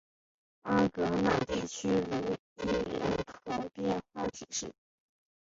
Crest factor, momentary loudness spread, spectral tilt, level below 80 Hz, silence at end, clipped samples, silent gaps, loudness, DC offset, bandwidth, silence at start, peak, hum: 18 dB; 9 LU; -5 dB/octave; -56 dBFS; 0.8 s; under 0.1%; 2.39-2.56 s; -33 LUFS; under 0.1%; 7.8 kHz; 0.65 s; -16 dBFS; none